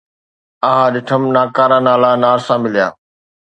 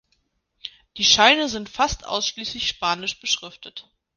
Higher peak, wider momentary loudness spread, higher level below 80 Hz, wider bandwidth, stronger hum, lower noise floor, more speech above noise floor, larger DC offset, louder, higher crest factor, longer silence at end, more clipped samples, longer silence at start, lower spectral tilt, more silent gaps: about the same, 0 dBFS vs 0 dBFS; second, 6 LU vs 24 LU; second, -62 dBFS vs -48 dBFS; second, 8.8 kHz vs 10.5 kHz; neither; first, under -90 dBFS vs -70 dBFS; first, over 78 dB vs 47 dB; neither; first, -13 LUFS vs -20 LUFS; second, 14 dB vs 24 dB; first, 0.6 s vs 0.35 s; neither; about the same, 0.65 s vs 0.65 s; first, -6.5 dB/octave vs -1 dB/octave; neither